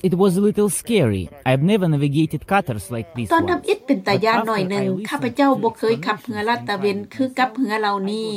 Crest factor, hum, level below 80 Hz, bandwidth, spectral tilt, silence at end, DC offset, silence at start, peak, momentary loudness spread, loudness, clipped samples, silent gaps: 14 dB; none; -52 dBFS; 16 kHz; -6 dB/octave; 0 s; under 0.1%; 0.05 s; -6 dBFS; 6 LU; -20 LUFS; under 0.1%; none